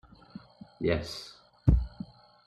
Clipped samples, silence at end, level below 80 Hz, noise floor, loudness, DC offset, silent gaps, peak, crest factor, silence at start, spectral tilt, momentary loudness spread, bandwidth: under 0.1%; 0.4 s; -36 dBFS; -50 dBFS; -31 LUFS; under 0.1%; none; -8 dBFS; 24 dB; 0.35 s; -7 dB/octave; 23 LU; 12 kHz